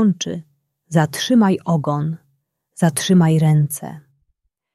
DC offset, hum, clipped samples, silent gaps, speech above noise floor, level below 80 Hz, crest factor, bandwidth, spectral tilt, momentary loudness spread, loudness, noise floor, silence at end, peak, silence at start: under 0.1%; none; under 0.1%; none; 53 dB; -58 dBFS; 16 dB; 14 kHz; -6 dB/octave; 14 LU; -18 LUFS; -70 dBFS; 0.75 s; -2 dBFS; 0 s